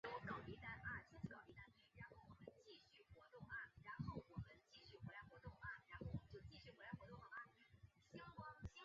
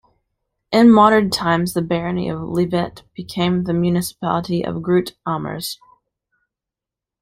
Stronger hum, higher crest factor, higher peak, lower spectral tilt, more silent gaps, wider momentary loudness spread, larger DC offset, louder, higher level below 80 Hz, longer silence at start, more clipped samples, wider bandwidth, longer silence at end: neither; about the same, 20 dB vs 18 dB; second, -38 dBFS vs -2 dBFS; second, -4.5 dB/octave vs -6 dB/octave; neither; second, 12 LU vs 15 LU; neither; second, -57 LUFS vs -18 LUFS; second, -70 dBFS vs -50 dBFS; second, 0.05 s vs 0.7 s; neither; second, 7.4 kHz vs 15.5 kHz; second, 0 s vs 1.5 s